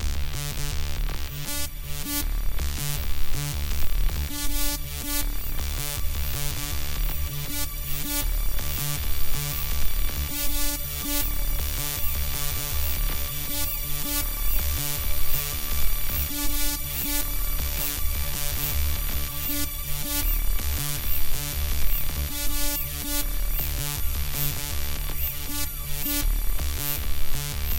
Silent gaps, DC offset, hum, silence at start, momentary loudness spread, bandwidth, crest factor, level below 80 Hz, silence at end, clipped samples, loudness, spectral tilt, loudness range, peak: none; 0.8%; none; 0 s; 4 LU; 17.5 kHz; 18 dB; -28 dBFS; 0 s; under 0.1%; -28 LUFS; -3 dB/octave; 2 LU; -4 dBFS